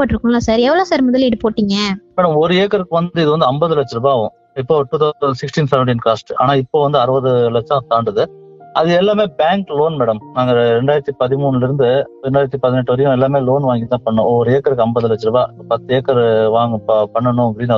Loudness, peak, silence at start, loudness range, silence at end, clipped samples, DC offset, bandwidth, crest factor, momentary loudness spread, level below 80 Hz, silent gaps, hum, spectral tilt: -15 LUFS; 0 dBFS; 0 s; 1 LU; 0 s; under 0.1%; under 0.1%; 7.6 kHz; 14 dB; 5 LU; -44 dBFS; none; none; -7 dB/octave